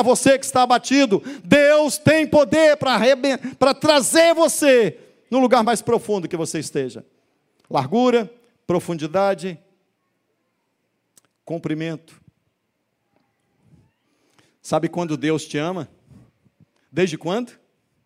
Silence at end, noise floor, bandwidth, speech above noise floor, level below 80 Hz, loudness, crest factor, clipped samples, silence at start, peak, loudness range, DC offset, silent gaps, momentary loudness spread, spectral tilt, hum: 0.6 s; -73 dBFS; 16 kHz; 54 dB; -62 dBFS; -18 LUFS; 20 dB; under 0.1%; 0 s; 0 dBFS; 18 LU; under 0.1%; none; 13 LU; -4 dB/octave; none